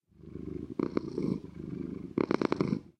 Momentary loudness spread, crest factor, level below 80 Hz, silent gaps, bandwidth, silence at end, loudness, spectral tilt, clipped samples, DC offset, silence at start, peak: 12 LU; 24 dB; -58 dBFS; none; 9.4 kHz; 0.1 s; -34 LUFS; -8 dB/octave; under 0.1%; under 0.1%; 0.2 s; -10 dBFS